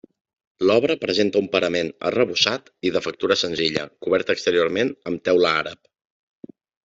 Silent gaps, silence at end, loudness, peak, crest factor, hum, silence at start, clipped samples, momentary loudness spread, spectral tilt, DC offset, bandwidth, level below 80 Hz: none; 1.1 s; -21 LUFS; -2 dBFS; 20 dB; none; 0.6 s; under 0.1%; 6 LU; -4 dB/octave; under 0.1%; 7.8 kHz; -62 dBFS